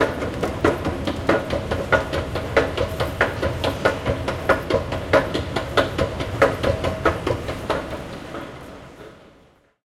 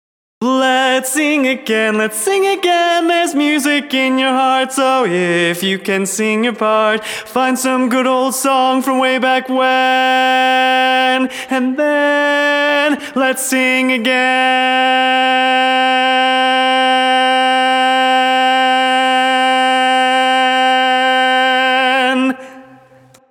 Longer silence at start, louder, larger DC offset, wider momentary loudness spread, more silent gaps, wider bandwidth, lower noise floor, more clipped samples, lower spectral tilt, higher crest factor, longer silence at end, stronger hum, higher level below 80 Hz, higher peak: second, 0 s vs 0.4 s; second, -23 LUFS vs -13 LUFS; neither; first, 13 LU vs 4 LU; neither; second, 16 kHz vs 18.5 kHz; first, -55 dBFS vs -46 dBFS; neither; first, -5.5 dB/octave vs -2.5 dB/octave; first, 20 dB vs 12 dB; second, 0.55 s vs 0.7 s; neither; first, -38 dBFS vs -72 dBFS; about the same, -4 dBFS vs -2 dBFS